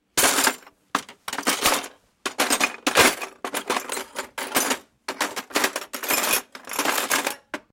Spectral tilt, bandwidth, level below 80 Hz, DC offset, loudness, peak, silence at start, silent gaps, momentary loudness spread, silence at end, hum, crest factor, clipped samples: -0.5 dB/octave; 17 kHz; -58 dBFS; under 0.1%; -23 LUFS; -2 dBFS; 0.15 s; none; 14 LU; 0.15 s; none; 22 dB; under 0.1%